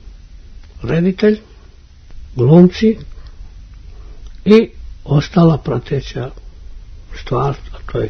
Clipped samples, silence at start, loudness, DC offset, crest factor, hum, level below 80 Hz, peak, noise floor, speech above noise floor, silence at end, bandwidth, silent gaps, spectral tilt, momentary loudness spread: 0.2%; 0.05 s; -14 LUFS; under 0.1%; 16 dB; none; -34 dBFS; 0 dBFS; -40 dBFS; 27 dB; 0 s; 6.4 kHz; none; -8.5 dB/octave; 19 LU